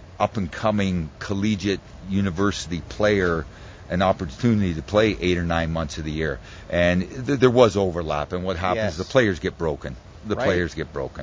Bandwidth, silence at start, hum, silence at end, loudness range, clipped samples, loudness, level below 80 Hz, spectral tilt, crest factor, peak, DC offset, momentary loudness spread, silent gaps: 8 kHz; 0 s; none; 0 s; 3 LU; under 0.1%; -23 LUFS; -38 dBFS; -6 dB/octave; 22 dB; 0 dBFS; under 0.1%; 10 LU; none